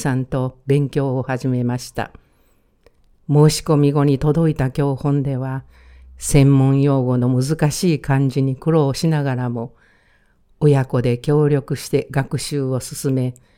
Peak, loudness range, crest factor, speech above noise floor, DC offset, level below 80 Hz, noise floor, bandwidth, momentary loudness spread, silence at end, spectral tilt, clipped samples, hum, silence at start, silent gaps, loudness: 0 dBFS; 3 LU; 18 dB; 40 dB; under 0.1%; -40 dBFS; -58 dBFS; 15.5 kHz; 10 LU; 0.25 s; -7 dB/octave; under 0.1%; none; 0 s; none; -18 LUFS